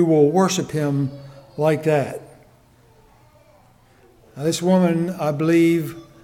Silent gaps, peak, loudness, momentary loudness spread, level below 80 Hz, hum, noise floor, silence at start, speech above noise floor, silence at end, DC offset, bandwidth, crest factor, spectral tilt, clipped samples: none; -4 dBFS; -20 LUFS; 14 LU; -60 dBFS; none; -53 dBFS; 0 s; 34 dB; 0.2 s; under 0.1%; 16 kHz; 16 dB; -6 dB/octave; under 0.1%